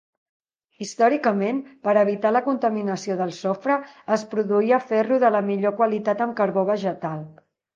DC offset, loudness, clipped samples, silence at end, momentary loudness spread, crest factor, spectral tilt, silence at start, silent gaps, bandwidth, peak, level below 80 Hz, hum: under 0.1%; -22 LUFS; under 0.1%; 0.45 s; 8 LU; 18 dB; -6.5 dB/octave; 0.8 s; none; 9.2 kHz; -6 dBFS; -76 dBFS; none